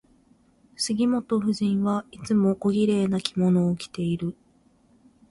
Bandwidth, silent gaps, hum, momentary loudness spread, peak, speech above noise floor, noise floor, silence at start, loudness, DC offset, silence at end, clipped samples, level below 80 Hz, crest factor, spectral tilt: 11.5 kHz; none; none; 7 LU; -6 dBFS; 37 dB; -61 dBFS; 0.8 s; -25 LUFS; under 0.1%; 1 s; under 0.1%; -60 dBFS; 18 dB; -6.5 dB/octave